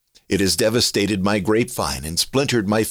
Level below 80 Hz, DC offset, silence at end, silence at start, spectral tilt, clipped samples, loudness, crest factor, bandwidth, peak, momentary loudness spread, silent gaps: -44 dBFS; under 0.1%; 0 s; 0.3 s; -4 dB/octave; under 0.1%; -19 LUFS; 12 dB; over 20 kHz; -8 dBFS; 5 LU; none